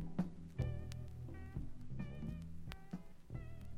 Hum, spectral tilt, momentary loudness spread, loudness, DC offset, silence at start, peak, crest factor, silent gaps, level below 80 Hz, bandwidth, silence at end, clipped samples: none; -8 dB/octave; 9 LU; -48 LUFS; under 0.1%; 0 s; -26 dBFS; 18 dB; none; -52 dBFS; 12 kHz; 0 s; under 0.1%